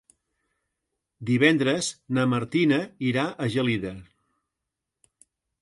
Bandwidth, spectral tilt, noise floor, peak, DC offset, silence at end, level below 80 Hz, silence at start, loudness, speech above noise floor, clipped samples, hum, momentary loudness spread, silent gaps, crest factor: 11.5 kHz; -5.5 dB/octave; -85 dBFS; -6 dBFS; under 0.1%; 1.6 s; -62 dBFS; 1.2 s; -24 LUFS; 61 dB; under 0.1%; none; 10 LU; none; 20 dB